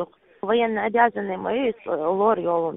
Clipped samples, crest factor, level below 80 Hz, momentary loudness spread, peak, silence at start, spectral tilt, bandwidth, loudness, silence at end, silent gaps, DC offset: under 0.1%; 18 dB; -62 dBFS; 7 LU; -6 dBFS; 0 s; -10 dB/octave; 3.9 kHz; -22 LUFS; 0 s; none; under 0.1%